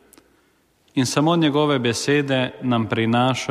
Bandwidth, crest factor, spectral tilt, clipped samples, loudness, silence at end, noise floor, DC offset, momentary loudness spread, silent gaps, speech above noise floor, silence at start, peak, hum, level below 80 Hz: 14.5 kHz; 16 dB; -5 dB/octave; under 0.1%; -20 LUFS; 0 s; -61 dBFS; under 0.1%; 5 LU; none; 42 dB; 0.95 s; -6 dBFS; none; -60 dBFS